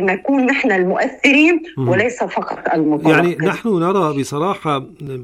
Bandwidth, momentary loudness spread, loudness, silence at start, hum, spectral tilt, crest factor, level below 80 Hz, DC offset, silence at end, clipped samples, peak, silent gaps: 14 kHz; 9 LU; -16 LUFS; 0 s; none; -6 dB/octave; 14 dB; -56 dBFS; under 0.1%; 0 s; under 0.1%; -2 dBFS; none